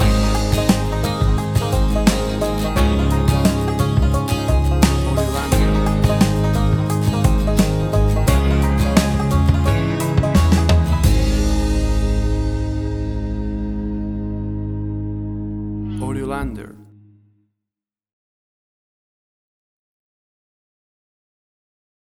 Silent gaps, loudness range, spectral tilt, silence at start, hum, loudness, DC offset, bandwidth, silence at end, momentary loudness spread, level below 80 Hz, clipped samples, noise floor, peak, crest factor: none; 11 LU; -6.5 dB/octave; 0 s; none; -18 LUFS; under 0.1%; 18.5 kHz; 5.2 s; 9 LU; -22 dBFS; under 0.1%; -87 dBFS; 0 dBFS; 18 dB